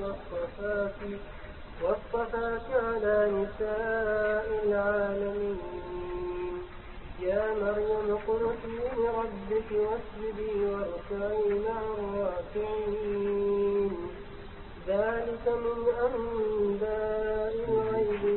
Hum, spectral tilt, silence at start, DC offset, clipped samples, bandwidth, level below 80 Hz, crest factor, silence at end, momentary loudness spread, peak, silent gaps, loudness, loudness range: none; -10 dB/octave; 0 s; under 0.1%; under 0.1%; 4.3 kHz; -48 dBFS; 16 dB; 0 s; 10 LU; -14 dBFS; none; -31 LUFS; 3 LU